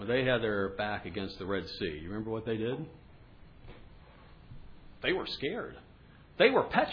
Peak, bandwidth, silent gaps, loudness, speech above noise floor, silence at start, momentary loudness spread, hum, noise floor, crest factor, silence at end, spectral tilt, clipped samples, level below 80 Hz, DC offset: -10 dBFS; 5.4 kHz; none; -32 LUFS; 24 dB; 0 s; 14 LU; none; -56 dBFS; 24 dB; 0 s; -7.5 dB/octave; under 0.1%; -56 dBFS; under 0.1%